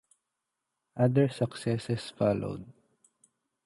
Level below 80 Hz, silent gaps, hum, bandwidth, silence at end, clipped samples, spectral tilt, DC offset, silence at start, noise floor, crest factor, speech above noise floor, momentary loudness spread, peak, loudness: -62 dBFS; none; none; 11.5 kHz; 0.95 s; under 0.1%; -7.5 dB/octave; under 0.1%; 0.95 s; -85 dBFS; 18 dB; 57 dB; 14 LU; -12 dBFS; -29 LUFS